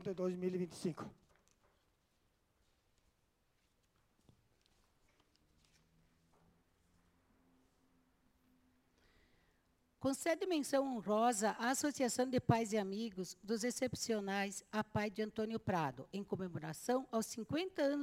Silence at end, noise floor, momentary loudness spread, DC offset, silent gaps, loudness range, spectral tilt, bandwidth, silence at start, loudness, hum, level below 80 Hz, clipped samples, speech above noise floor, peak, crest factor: 0 s; -79 dBFS; 9 LU; under 0.1%; none; 10 LU; -4.5 dB/octave; 16.5 kHz; 0 s; -39 LUFS; none; -72 dBFS; under 0.1%; 40 dB; -16 dBFS; 24 dB